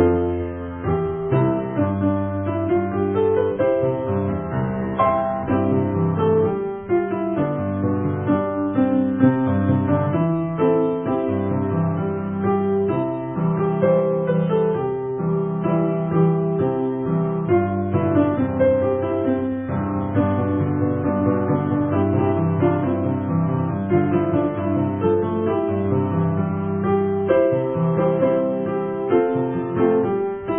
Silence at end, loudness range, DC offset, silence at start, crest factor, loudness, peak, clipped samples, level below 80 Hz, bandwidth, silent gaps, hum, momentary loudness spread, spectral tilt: 0 s; 1 LU; under 0.1%; 0 s; 18 dB; -21 LUFS; -2 dBFS; under 0.1%; -42 dBFS; 3.7 kHz; none; none; 5 LU; -13.5 dB/octave